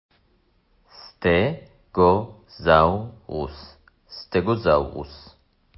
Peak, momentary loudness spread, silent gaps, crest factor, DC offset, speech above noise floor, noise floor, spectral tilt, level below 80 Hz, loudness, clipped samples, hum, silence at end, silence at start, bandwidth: -4 dBFS; 21 LU; none; 20 dB; under 0.1%; 42 dB; -63 dBFS; -10.5 dB/octave; -42 dBFS; -22 LUFS; under 0.1%; none; 0.6 s; 1.05 s; 5.8 kHz